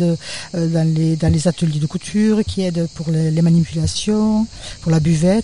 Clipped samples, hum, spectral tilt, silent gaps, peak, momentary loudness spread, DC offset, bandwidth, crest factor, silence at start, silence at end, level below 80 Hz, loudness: under 0.1%; none; -6.5 dB/octave; none; -4 dBFS; 7 LU; 0.6%; 11 kHz; 12 dB; 0 s; 0 s; -38 dBFS; -18 LUFS